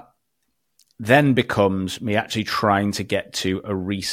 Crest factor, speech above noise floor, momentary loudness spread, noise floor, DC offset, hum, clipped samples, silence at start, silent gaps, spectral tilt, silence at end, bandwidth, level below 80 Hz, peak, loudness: 20 dB; 54 dB; 9 LU; -75 dBFS; under 0.1%; none; under 0.1%; 1 s; none; -5 dB/octave; 0 s; 16 kHz; -56 dBFS; -2 dBFS; -21 LUFS